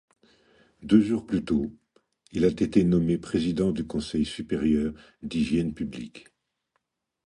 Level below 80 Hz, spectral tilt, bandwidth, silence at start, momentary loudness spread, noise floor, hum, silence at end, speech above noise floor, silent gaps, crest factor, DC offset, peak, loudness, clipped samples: -48 dBFS; -7.5 dB/octave; 11 kHz; 0.8 s; 14 LU; -78 dBFS; none; 1.05 s; 52 dB; none; 20 dB; under 0.1%; -6 dBFS; -26 LUFS; under 0.1%